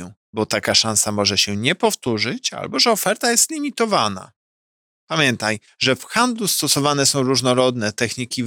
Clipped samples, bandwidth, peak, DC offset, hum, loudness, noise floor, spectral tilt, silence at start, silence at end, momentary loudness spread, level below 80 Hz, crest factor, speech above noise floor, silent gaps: under 0.1%; 19 kHz; -2 dBFS; under 0.1%; none; -18 LUFS; under -90 dBFS; -2.5 dB/octave; 0 s; 0 s; 7 LU; -60 dBFS; 18 dB; over 71 dB; 0.17-0.33 s, 4.36-5.07 s